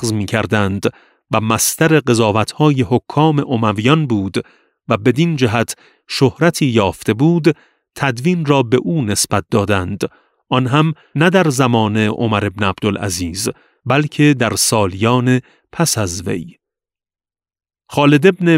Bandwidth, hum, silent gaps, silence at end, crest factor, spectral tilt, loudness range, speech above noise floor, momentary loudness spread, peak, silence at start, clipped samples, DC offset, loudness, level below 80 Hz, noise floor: 16 kHz; none; none; 0 s; 16 dB; -5 dB/octave; 2 LU; over 75 dB; 9 LU; 0 dBFS; 0 s; under 0.1%; under 0.1%; -15 LUFS; -48 dBFS; under -90 dBFS